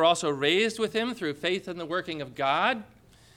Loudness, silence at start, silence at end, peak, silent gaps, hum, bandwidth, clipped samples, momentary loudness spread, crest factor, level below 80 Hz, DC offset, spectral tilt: -27 LUFS; 0 s; 0.5 s; -10 dBFS; none; none; 16 kHz; under 0.1%; 8 LU; 18 dB; -66 dBFS; under 0.1%; -3.5 dB/octave